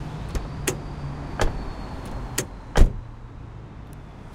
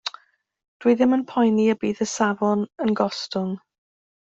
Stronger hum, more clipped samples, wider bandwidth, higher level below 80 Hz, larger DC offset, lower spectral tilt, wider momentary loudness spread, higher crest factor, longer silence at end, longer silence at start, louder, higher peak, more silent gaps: neither; neither; first, 16.5 kHz vs 8 kHz; first, -28 dBFS vs -66 dBFS; neither; about the same, -4.5 dB/octave vs -5 dB/octave; first, 18 LU vs 9 LU; first, 26 dB vs 16 dB; second, 0 s vs 0.75 s; about the same, 0 s vs 0.05 s; second, -29 LUFS vs -22 LUFS; first, 0 dBFS vs -6 dBFS; second, none vs 0.68-0.80 s